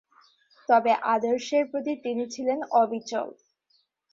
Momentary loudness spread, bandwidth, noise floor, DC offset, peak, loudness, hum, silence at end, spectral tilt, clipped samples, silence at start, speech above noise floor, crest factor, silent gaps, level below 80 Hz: 10 LU; 7.6 kHz; -70 dBFS; under 0.1%; -10 dBFS; -26 LUFS; none; 0.8 s; -4 dB/octave; under 0.1%; 0.7 s; 45 dB; 18 dB; none; -76 dBFS